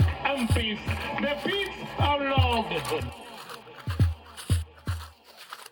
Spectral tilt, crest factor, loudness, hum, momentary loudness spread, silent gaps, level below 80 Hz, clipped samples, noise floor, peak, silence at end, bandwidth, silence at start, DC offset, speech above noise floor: -5.5 dB/octave; 18 dB; -28 LUFS; none; 18 LU; none; -44 dBFS; under 0.1%; -47 dBFS; -10 dBFS; 0.05 s; 18 kHz; 0 s; under 0.1%; 20 dB